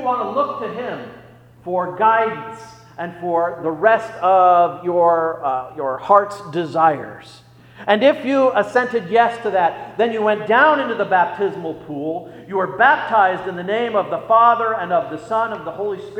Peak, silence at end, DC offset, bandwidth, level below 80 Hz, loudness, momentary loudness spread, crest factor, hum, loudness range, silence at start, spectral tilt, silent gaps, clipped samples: 0 dBFS; 0 s; under 0.1%; 10 kHz; -62 dBFS; -18 LUFS; 14 LU; 18 dB; none; 3 LU; 0 s; -6 dB/octave; none; under 0.1%